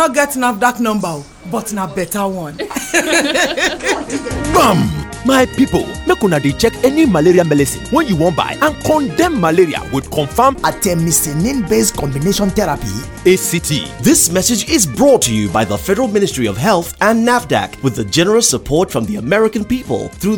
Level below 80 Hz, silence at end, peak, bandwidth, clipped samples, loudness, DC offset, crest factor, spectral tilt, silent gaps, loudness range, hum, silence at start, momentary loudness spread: -34 dBFS; 0 s; 0 dBFS; over 20 kHz; under 0.1%; -14 LUFS; under 0.1%; 14 dB; -4 dB/octave; none; 2 LU; none; 0 s; 9 LU